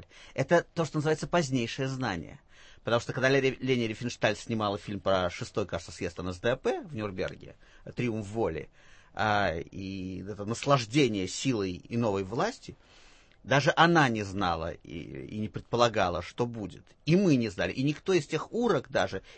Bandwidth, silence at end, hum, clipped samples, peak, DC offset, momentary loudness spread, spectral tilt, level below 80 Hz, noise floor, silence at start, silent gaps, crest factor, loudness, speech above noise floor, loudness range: 8.8 kHz; 0 s; none; under 0.1%; -8 dBFS; under 0.1%; 13 LU; -5.5 dB/octave; -56 dBFS; -57 dBFS; 0 s; none; 22 dB; -29 LUFS; 27 dB; 5 LU